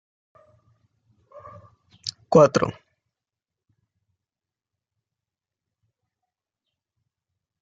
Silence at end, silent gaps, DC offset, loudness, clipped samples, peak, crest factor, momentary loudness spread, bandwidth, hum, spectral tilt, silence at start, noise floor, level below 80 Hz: 4.9 s; none; under 0.1%; -20 LUFS; under 0.1%; -2 dBFS; 26 dB; 18 LU; 9 kHz; none; -6 dB/octave; 2.05 s; -90 dBFS; -64 dBFS